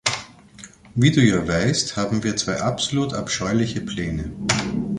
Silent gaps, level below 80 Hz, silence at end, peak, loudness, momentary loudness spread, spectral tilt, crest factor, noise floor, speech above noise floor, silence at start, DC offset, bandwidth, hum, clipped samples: none; -42 dBFS; 0 s; -2 dBFS; -21 LUFS; 9 LU; -4.5 dB/octave; 20 dB; -45 dBFS; 24 dB; 0.05 s; under 0.1%; 11.5 kHz; none; under 0.1%